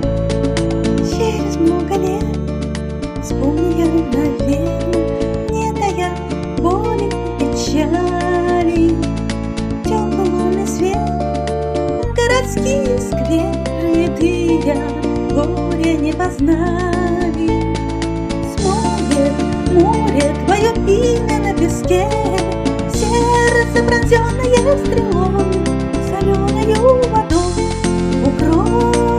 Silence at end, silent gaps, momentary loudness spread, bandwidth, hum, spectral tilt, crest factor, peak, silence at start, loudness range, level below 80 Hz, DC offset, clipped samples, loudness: 0 s; none; 6 LU; 14.5 kHz; none; -6 dB/octave; 16 dB; 0 dBFS; 0 s; 3 LU; -26 dBFS; under 0.1%; under 0.1%; -16 LUFS